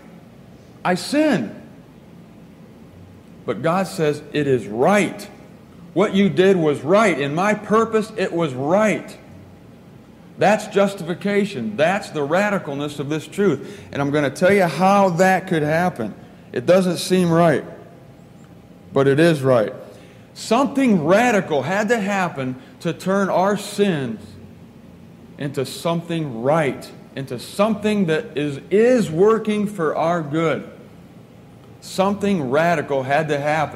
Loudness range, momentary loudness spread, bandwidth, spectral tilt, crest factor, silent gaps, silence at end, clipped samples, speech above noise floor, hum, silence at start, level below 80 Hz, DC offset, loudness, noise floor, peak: 6 LU; 12 LU; 15.5 kHz; -6 dB/octave; 18 dB; none; 0 s; under 0.1%; 25 dB; none; 0.15 s; -60 dBFS; under 0.1%; -19 LUFS; -44 dBFS; -2 dBFS